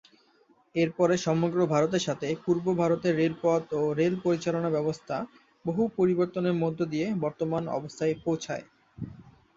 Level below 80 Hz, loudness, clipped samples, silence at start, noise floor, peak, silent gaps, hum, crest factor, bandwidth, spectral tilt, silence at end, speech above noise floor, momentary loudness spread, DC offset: -64 dBFS; -28 LUFS; under 0.1%; 0.75 s; -64 dBFS; -10 dBFS; none; none; 18 dB; 7.8 kHz; -6.5 dB/octave; 0.25 s; 37 dB; 10 LU; under 0.1%